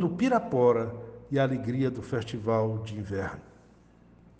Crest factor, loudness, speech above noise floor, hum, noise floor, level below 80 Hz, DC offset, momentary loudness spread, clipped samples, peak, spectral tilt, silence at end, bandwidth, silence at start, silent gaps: 18 dB; -28 LUFS; 29 dB; none; -57 dBFS; -58 dBFS; under 0.1%; 12 LU; under 0.1%; -10 dBFS; -8 dB/octave; 0.9 s; 9 kHz; 0 s; none